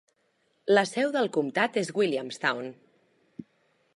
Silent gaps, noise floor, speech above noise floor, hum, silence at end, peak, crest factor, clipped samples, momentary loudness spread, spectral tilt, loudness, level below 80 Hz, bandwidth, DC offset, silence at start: none; -71 dBFS; 45 dB; none; 0.55 s; -10 dBFS; 20 dB; under 0.1%; 24 LU; -4.5 dB/octave; -27 LUFS; -82 dBFS; 11.5 kHz; under 0.1%; 0.65 s